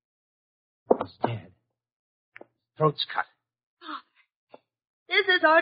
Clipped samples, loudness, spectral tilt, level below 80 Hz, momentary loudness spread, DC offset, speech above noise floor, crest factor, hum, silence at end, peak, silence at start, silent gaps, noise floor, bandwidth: under 0.1%; -25 LUFS; -2 dB/octave; -72 dBFS; 20 LU; under 0.1%; 18 dB; 24 dB; none; 0 s; -4 dBFS; 0.9 s; 1.92-2.32 s, 3.63-3.77 s, 4.36-4.47 s, 4.87-5.06 s; -43 dBFS; 5.2 kHz